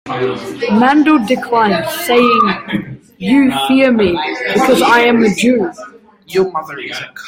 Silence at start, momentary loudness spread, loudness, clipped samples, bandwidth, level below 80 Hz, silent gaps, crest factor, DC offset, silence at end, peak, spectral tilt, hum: 0.05 s; 13 LU; -12 LUFS; under 0.1%; 16.5 kHz; -50 dBFS; none; 12 dB; under 0.1%; 0 s; 0 dBFS; -5 dB/octave; none